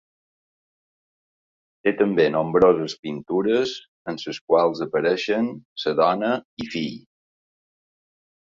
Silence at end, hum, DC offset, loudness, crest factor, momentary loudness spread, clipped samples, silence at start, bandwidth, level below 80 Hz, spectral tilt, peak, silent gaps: 1.5 s; none; under 0.1%; -22 LUFS; 20 dB; 13 LU; under 0.1%; 1.85 s; 7.6 kHz; -60 dBFS; -6 dB/octave; -4 dBFS; 2.99-3.03 s, 3.88-4.05 s, 4.41-4.48 s, 5.65-5.76 s, 6.45-6.57 s